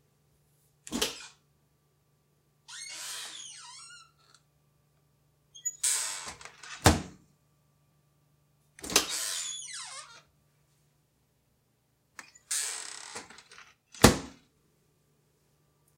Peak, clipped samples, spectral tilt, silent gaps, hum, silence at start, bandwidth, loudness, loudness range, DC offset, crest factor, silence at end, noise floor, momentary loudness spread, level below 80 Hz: 0 dBFS; under 0.1%; -3 dB/octave; none; none; 0.85 s; 16 kHz; -30 LUFS; 13 LU; under 0.1%; 34 dB; 1.65 s; -72 dBFS; 25 LU; -50 dBFS